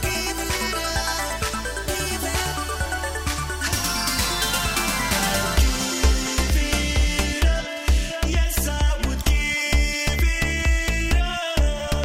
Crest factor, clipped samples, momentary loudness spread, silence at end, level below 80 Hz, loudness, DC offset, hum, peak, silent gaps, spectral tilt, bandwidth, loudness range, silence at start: 16 dB; under 0.1%; 5 LU; 0 s; -24 dBFS; -22 LUFS; under 0.1%; none; -6 dBFS; none; -3.5 dB/octave; 16.5 kHz; 3 LU; 0 s